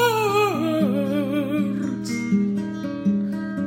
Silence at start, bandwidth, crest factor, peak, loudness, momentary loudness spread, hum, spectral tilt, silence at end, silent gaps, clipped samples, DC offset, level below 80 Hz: 0 s; 16.5 kHz; 14 dB; -8 dBFS; -23 LUFS; 7 LU; none; -6 dB/octave; 0 s; none; under 0.1%; under 0.1%; -60 dBFS